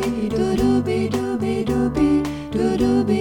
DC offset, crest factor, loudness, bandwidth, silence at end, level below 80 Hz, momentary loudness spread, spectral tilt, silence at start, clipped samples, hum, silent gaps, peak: under 0.1%; 12 dB; -20 LUFS; 17 kHz; 0 s; -38 dBFS; 4 LU; -7 dB/octave; 0 s; under 0.1%; none; none; -8 dBFS